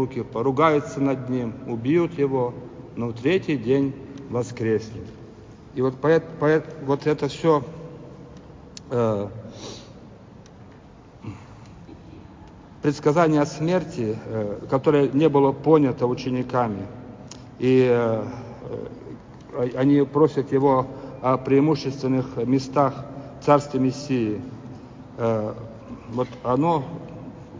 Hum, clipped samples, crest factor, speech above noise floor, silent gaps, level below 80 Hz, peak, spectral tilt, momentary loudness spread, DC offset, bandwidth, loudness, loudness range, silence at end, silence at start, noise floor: none; under 0.1%; 20 dB; 25 dB; none; -54 dBFS; -2 dBFS; -7.5 dB/octave; 21 LU; under 0.1%; 7.6 kHz; -22 LUFS; 10 LU; 0 s; 0 s; -46 dBFS